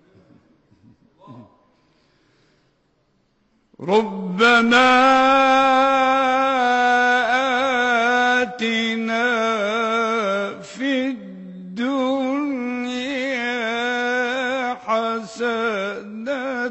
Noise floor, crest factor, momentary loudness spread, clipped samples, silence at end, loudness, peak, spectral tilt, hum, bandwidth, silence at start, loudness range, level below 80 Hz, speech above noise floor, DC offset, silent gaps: -64 dBFS; 16 dB; 12 LU; under 0.1%; 0 s; -19 LUFS; -4 dBFS; -4 dB/octave; none; 8.4 kHz; 1.25 s; 8 LU; -60 dBFS; 49 dB; under 0.1%; none